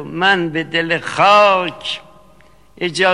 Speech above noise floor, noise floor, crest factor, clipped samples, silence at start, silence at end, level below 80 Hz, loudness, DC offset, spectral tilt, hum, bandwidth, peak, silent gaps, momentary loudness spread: 34 dB; -49 dBFS; 16 dB; under 0.1%; 0 s; 0 s; -56 dBFS; -15 LUFS; 0.4%; -4 dB/octave; none; 11.5 kHz; 0 dBFS; none; 15 LU